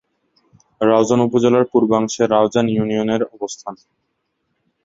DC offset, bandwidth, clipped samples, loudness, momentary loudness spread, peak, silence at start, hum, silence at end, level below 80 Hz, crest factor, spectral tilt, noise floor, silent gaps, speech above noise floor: under 0.1%; 8 kHz; under 0.1%; -17 LUFS; 13 LU; -2 dBFS; 0.8 s; none; 1.1 s; -58 dBFS; 16 dB; -6 dB/octave; -71 dBFS; none; 55 dB